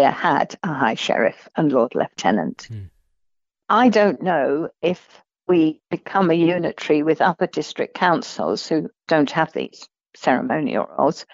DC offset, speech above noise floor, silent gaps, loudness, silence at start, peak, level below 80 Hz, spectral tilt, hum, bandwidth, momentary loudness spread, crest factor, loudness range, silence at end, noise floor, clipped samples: under 0.1%; 54 dB; none; -20 LUFS; 0 s; -4 dBFS; -64 dBFS; -6 dB/octave; none; 7.8 kHz; 9 LU; 16 dB; 2 LU; 0.1 s; -73 dBFS; under 0.1%